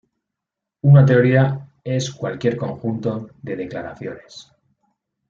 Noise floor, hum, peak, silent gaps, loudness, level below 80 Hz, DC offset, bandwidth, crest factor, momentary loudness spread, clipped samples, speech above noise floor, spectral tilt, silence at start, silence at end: -84 dBFS; none; -2 dBFS; none; -18 LUFS; -56 dBFS; under 0.1%; 7.4 kHz; 18 dB; 19 LU; under 0.1%; 66 dB; -7.5 dB/octave; 0.85 s; 0.9 s